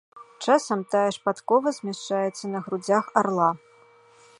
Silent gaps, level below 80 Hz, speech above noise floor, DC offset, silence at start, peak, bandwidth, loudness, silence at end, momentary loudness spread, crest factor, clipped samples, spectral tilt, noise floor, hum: none; -76 dBFS; 31 dB; under 0.1%; 0.15 s; -4 dBFS; 11.5 kHz; -24 LUFS; 0.8 s; 9 LU; 22 dB; under 0.1%; -5 dB/octave; -55 dBFS; none